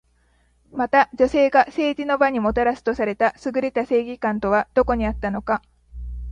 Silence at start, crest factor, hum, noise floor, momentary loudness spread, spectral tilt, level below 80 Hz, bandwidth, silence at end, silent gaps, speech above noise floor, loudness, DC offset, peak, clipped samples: 0.75 s; 18 dB; none; -61 dBFS; 9 LU; -6.5 dB/octave; -40 dBFS; 9.6 kHz; 0 s; none; 41 dB; -21 LUFS; under 0.1%; -2 dBFS; under 0.1%